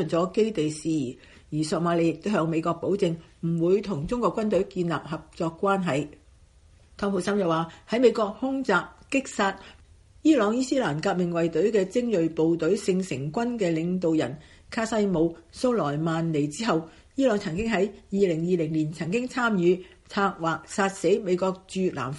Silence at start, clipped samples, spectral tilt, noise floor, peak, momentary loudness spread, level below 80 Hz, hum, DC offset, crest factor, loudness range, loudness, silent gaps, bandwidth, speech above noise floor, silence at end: 0 s; under 0.1%; -6 dB/octave; -55 dBFS; -8 dBFS; 6 LU; -54 dBFS; none; under 0.1%; 18 dB; 2 LU; -26 LUFS; none; 11.5 kHz; 30 dB; 0 s